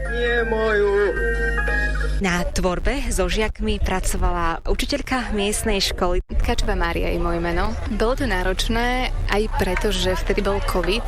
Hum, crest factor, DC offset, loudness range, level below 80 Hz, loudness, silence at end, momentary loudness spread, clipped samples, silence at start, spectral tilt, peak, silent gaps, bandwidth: none; 12 dB; under 0.1%; 2 LU; -24 dBFS; -22 LUFS; 0 s; 4 LU; under 0.1%; 0 s; -4.5 dB/octave; -8 dBFS; none; 15.5 kHz